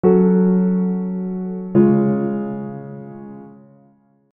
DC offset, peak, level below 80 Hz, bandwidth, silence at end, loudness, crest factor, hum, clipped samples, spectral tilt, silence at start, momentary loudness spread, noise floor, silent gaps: under 0.1%; -2 dBFS; -56 dBFS; 2.8 kHz; 0.85 s; -18 LUFS; 16 dB; none; under 0.1%; -14.5 dB/octave; 0.05 s; 21 LU; -55 dBFS; none